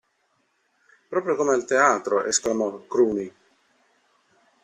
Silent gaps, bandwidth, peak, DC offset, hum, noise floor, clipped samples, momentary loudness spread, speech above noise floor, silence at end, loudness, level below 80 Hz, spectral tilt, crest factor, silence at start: none; 12 kHz; -6 dBFS; under 0.1%; none; -69 dBFS; under 0.1%; 10 LU; 47 dB; 1.35 s; -23 LUFS; -66 dBFS; -3 dB/octave; 20 dB; 1.1 s